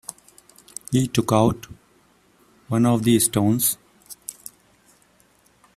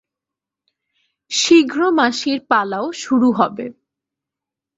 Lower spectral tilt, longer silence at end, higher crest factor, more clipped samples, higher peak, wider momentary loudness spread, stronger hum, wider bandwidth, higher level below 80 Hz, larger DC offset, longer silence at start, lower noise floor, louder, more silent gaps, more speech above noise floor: first, -5 dB/octave vs -3 dB/octave; first, 1.45 s vs 1.05 s; about the same, 22 dB vs 18 dB; neither; about the same, -2 dBFS vs -2 dBFS; first, 22 LU vs 11 LU; second, none vs 50 Hz at -55 dBFS; first, 16 kHz vs 7.8 kHz; first, -52 dBFS vs -64 dBFS; neither; second, 0.1 s vs 1.3 s; second, -59 dBFS vs -86 dBFS; second, -20 LUFS vs -16 LUFS; neither; second, 40 dB vs 70 dB